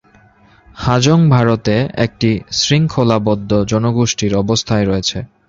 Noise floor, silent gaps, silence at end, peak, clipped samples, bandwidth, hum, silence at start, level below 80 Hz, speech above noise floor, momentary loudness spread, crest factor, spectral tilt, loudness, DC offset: -48 dBFS; none; 0.25 s; 0 dBFS; under 0.1%; 7.6 kHz; none; 0.75 s; -38 dBFS; 34 dB; 6 LU; 14 dB; -5.5 dB/octave; -14 LUFS; under 0.1%